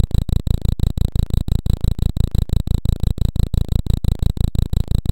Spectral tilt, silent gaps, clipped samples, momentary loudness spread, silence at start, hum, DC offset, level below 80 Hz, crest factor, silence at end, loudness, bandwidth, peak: -7.5 dB/octave; none; under 0.1%; 1 LU; 0 s; none; under 0.1%; -20 dBFS; 16 dB; 0 s; -21 LUFS; 16.5 kHz; -2 dBFS